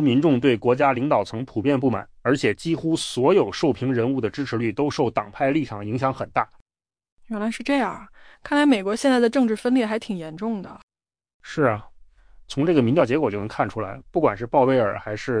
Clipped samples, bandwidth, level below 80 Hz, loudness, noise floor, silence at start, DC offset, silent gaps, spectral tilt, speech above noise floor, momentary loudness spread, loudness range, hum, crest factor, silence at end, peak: under 0.1%; 10.5 kHz; -54 dBFS; -22 LUFS; -48 dBFS; 0 s; under 0.1%; 6.61-6.66 s, 7.12-7.17 s, 10.83-10.88 s, 11.34-11.40 s; -6.5 dB/octave; 27 dB; 10 LU; 4 LU; none; 16 dB; 0 s; -6 dBFS